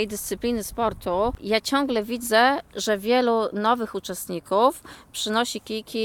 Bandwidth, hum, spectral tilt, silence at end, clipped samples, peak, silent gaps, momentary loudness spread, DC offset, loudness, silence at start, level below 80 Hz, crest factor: 19 kHz; none; -3.5 dB/octave; 0 s; under 0.1%; -6 dBFS; none; 10 LU; under 0.1%; -24 LUFS; 0 s; -48 dBFS; 18 dB